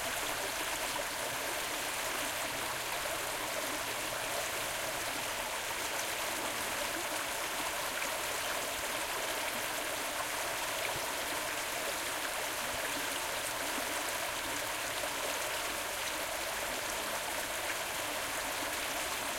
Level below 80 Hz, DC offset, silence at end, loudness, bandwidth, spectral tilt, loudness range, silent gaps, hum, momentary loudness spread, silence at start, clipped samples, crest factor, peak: -60 dBFS; under 0.1%; 0 s; -35 LUFS; 16.5 kHz; -0.5 dB/octave; 0 LU; none; none; 1 LU; 0 s; under 0.1%; 16 dB; -20 dBFS